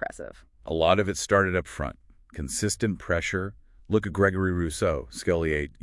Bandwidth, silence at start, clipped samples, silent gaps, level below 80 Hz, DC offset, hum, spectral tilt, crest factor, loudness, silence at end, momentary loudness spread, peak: 12 kHz; 0 s; under 0.1%; none; -46 dBFS; under 0.1%; none; -5 dB/octave; 22 dB; -26 LUFS; 0.1 s; 14 LU; -6 dBFS